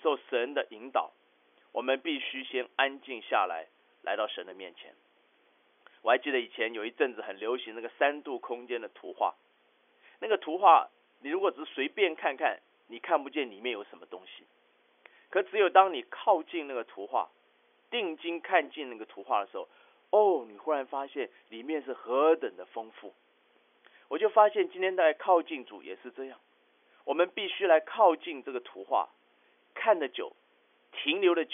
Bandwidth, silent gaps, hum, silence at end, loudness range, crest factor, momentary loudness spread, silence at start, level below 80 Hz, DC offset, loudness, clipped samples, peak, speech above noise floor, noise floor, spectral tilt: 3.7 kHz; none; none; 0 s; 5 LU; 24 dB; 19 LU; 0.05 s; under -90 dBFS; under 0.1%; -30 LUFS; under 0.1%; -8 dBFS; 38 dB; -68 dBFS; 4.5 dB/octave